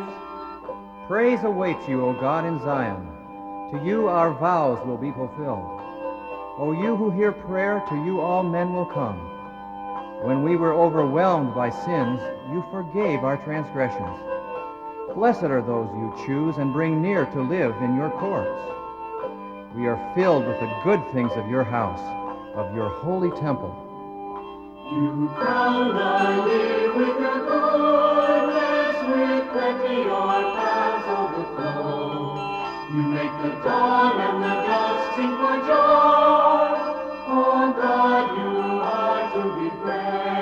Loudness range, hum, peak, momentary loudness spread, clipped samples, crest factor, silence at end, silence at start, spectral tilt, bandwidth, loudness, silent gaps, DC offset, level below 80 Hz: 7 LU; none; -6 dBFS; 14 LU; under 0.1%; 16 dB; 0 s; 0 s; -7.5 dB/octave; 7.6 kHz; -23 LUFS; none; under 0.1%; -58 dBFS